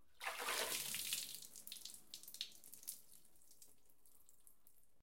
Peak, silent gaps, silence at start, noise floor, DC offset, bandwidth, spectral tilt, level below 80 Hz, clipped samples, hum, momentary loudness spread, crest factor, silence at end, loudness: -22 dBFS; none; 0.2 s; -74 dBFS; under 0.1%; 17 kHz; 1 dB/octave; -84 dBFS; under 0.1%; none; 24 LU; 28 dB; 0.3 s; -45 LUFS